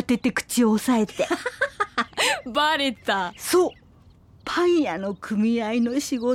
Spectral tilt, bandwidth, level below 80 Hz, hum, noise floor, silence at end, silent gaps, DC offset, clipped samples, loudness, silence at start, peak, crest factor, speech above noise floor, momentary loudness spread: -3.5 dB/octave; 16.5 kHz; -56 dBFS; none; -52 dBFS; 0 s; none; under 0.1%; under 0.1%; -23 LUFS; 0 s; -8 dBFS; 14 dB; 30 dB; 6 LU